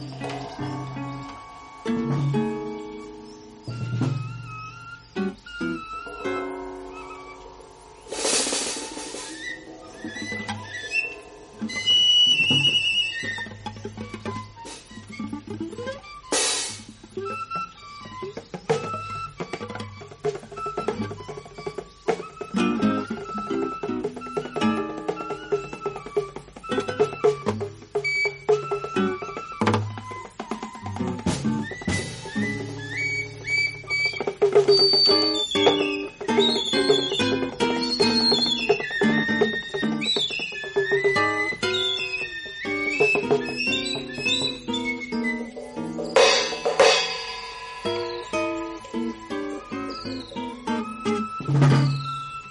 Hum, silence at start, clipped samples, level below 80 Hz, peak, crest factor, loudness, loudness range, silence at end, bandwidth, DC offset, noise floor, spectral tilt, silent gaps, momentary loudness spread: none; 0 s; under 0.1%; -54 dBFS; -4 dBFS; 22 dB; -24 LUFS; 12 LU; 0 s; 11.5 kHz; under 0.1%; -46 dBFS; -3.5 dB/octave; none; 18 LU